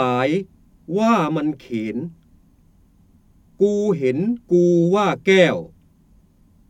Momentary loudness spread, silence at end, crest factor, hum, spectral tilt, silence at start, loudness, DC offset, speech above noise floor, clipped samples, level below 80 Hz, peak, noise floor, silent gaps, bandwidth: 12 LU; 1.05 s; 18 dB; none; -6.5 dB/octave; 0 s; -19 LUFS; under 0.1%; 36 dB; under 0.1%; -56 dBFS; -2 dBFS; -54 dBFS; none; 9.2 kHz